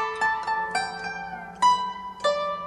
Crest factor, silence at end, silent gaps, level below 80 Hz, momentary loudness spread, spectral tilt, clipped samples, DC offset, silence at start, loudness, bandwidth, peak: 16 dB; 0 s; none; -60 dBFS; 11 LU; -2 dB/octave; under 0.1%; under 0.1%; 0 s; -26 LUFS; 11.5 kHz; -10 dBFS